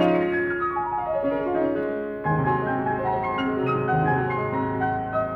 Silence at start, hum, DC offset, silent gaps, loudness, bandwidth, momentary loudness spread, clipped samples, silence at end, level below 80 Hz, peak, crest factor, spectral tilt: 0 s; none; under 0.1%; none; -24 LUFS; 6 kHz; 4 LU; under 0.1%; 0 s; -50 dBFS; -8 dBFS; 16 dB; -9 dB/octave